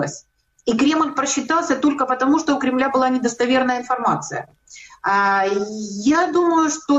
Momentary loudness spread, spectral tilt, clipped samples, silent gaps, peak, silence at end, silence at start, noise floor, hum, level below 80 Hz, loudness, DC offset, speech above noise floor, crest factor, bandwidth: 10 LU; -3.5 dB/octave; under 0.1%; none; -8 dBFS; 0 s; 0 s; -41 dBFS; none; -58 dBFS; -19 LUFS; under 0.1%; 22 dB; 12 dB; 8.2 kHz